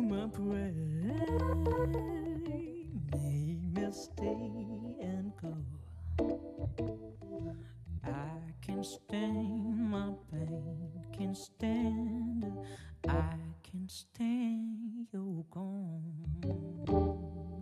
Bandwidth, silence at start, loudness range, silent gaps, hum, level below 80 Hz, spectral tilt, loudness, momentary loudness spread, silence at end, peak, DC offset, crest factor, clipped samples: 13.5 kHz; 0 s; 5 LU; none; none; -52 dBFS; -7.5 dB/octave; -38 LUFS; 10 LU; 0 s; -20 dBFS; under 0.1%; 18 dB; under 0.1%